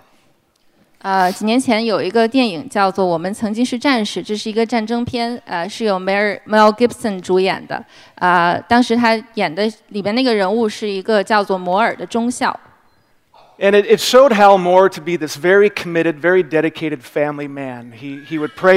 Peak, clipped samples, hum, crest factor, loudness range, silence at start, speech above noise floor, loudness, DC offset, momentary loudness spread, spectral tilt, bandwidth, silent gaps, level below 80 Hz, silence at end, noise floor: 0 dBFS; under 0.1%; none; 16 dB; 5 LU; 1.05 s; 41 dB; -16 LUFS; under 0.1%; 12 LU; -4.5 dB/octave; 16 kHz; none; -58 dBFS; 0 s; -56 dBFS